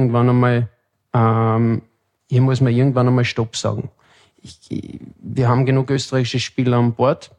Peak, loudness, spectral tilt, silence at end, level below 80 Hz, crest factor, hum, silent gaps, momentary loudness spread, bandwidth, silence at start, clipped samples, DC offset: -4 dBFS; -18 LUFS; -7 dB/octave; 0.15 s; -54 dBFS; 14 dB; none; none; 14 LU; 9.6 kHz; 0 s; under 0.1%; under 0.1%